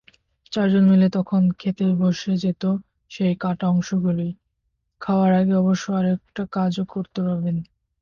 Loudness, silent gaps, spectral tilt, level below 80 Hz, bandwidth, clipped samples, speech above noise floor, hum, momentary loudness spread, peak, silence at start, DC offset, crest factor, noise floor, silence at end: -21 LUFS; none; -8 dB/octave; -58 dBFS; 7 kHz; under 0.1%; 54 dB; none; 11 LU; -8 dBFS; 0.5 s; under 0.1%; 12 dB; -74 dBFS; 0.4 s